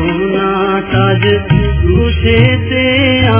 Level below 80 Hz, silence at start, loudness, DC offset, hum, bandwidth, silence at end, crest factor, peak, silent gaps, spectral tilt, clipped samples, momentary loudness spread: -20 dBFS; 0 s; -11 LUFS; under 0.1%; none; 4 kHz; 0 s; 10 dB; 0 dBFS; none; -10.5 dB/octave; 0.2%; 4 LU